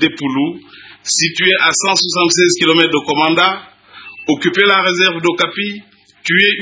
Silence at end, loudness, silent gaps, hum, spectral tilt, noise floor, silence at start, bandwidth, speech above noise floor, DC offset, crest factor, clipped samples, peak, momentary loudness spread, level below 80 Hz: 0 s; -12 LUFS; none; none; -2.5 dB/octave; -36 dBFS; 0 s; 8 kHz; 22 dB; under 0.1%; 14 dB; under 0.1%; 0 dBFS; 14 LU; -62 dBFS